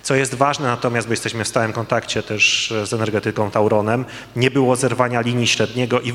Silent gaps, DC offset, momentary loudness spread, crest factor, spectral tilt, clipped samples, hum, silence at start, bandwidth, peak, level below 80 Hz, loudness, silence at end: none; under 0.1%; 6 LU; 18 dB; -4 dB/octave; under 0.1%; none; 0.05 s; 15.5 kHz; 0 dBFS; -54 dBFS; -18 LUFS; 0 s